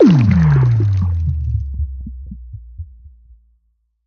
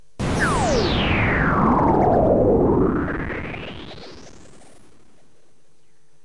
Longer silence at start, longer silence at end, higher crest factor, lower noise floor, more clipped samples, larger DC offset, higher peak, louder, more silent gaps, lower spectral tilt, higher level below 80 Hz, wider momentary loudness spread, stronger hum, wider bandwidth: second, 0 s vs 0.2 s; second, 1 s vs 1.95 s; about the same, 14 dB vs 16 dB; about the same, -64 dBFS vs -63 dBFS; neither; second, under 0.1% vs 0.9%; first, -2 dBFS vs -6 dBFS; first, -15 LUFS vs -19 LUFS; neither; first, -9.5 dB/octave vs -6 dB/octave; first, -28 dBFS vs -34 dBFS; first, 24 LU vs 18 LU; neither; second, 6.6 kHz vs 11.5 kHz